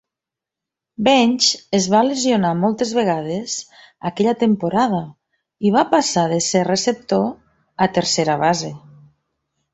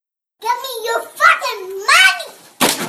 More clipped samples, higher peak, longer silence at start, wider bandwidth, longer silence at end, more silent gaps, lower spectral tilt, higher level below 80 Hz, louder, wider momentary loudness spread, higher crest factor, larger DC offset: neither; about the same, 0 dBFS vs 0 dBFS; first, 1 s vs 0.4 s; second, 8.2 kHz vs 15 kHz; first, 0.95 s vs 0 s; neither; first, -4 dB/octave vs -0.5 dB/octave; about the same, -58 dBFS vs -62 dBFS; second, -18 LUFS vs -14 LUFS; second, 10 LU vs 15 LU; about the same, 18 dB vs 16 dB; neither